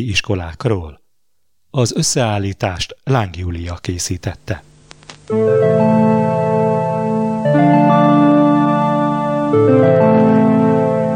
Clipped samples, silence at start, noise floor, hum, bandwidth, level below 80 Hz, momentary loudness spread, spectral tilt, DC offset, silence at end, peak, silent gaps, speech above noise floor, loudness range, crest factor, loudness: under 0.1%; 0 s; -72 dBFS; none; 16 kHz; -42 dBFS; 13 LU; -6 dB/octave; under 0.1%; 0 s; -2 dBFS; none; 55 dB; 8 LU; 14 dB; -15 LUFS